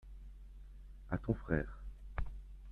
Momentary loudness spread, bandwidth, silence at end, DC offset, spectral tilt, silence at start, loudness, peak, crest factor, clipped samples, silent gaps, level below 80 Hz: 20 LU; 4.5 kHz; 0 s; under 0.1%; -10 dB/octave; 0 s; -41 LUFS; -18 dBFS; 24 dB; under 0.1%; none; -46 dBFS